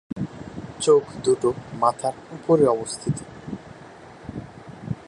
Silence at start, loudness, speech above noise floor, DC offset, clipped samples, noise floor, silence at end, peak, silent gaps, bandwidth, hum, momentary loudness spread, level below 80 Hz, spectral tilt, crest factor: 0.1 s; -23 LUFS; 22 dB; under 0.1%; under 0.1%; -44 dBFS; 0.05 s; -4 dBFS; none; 11 kHz; none; 21 LU; -54 dBFS; -6 dB/octave; 20 dB